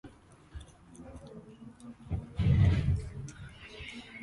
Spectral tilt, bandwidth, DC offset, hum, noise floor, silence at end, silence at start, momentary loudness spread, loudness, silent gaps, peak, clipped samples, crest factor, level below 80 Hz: -7.5 dB/octave; 11 kHz; under 0.1%; none; -55 dBFS; 0 s; 0.05 s; 25 LU; -31 LUFS; none; -14 dBFS; under 0.1%; 18 dB; -40 dBFS